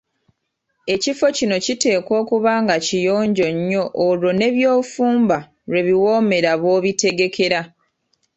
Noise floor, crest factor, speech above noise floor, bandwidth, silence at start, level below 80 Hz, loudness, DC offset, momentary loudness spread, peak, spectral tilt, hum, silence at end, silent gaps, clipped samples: -73 dBFS; 16 dB; 56 dB; 8.2 kHz; 0.85 s; -60 dBFS; -18 LUFS; under 0.1%; 5 LU; -2 dBFS; -4.5 dB/octave; none; 0.7 s; none; under 0.1%